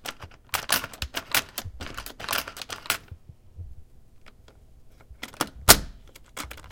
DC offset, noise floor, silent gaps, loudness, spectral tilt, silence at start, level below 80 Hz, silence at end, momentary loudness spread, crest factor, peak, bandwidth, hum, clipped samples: under 0.1%; -52 dBFS; none; -24 LUFS; -1.5 dB/octave; 0 s; -44 dBFS; 0 s; 28 LU; 30 dB; 0 dBFS; 17 kHz; none; under 0.1%